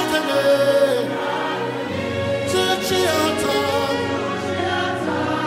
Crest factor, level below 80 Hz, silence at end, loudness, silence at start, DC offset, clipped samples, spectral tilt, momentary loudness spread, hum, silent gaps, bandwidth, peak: 14 dB; -54 dBFS; 0 s; -20 LUFS; 0 s; under 0.1%; under 0.1%; -4 dB/octave; 7 LU; none; none; 16 kHz; -6 dBFS